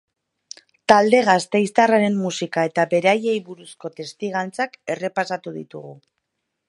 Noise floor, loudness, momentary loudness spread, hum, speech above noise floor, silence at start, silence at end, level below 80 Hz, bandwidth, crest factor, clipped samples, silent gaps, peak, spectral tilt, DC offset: -77 dBFS; -19 LUFS; 20 LU; none; 57 dB; 0.9 s; 0.75 s; -68 dBFS; 11.5 kHz; 20 dB; under 0.1%; none; 0 dBFS; -5 dB/octave; under 0.1%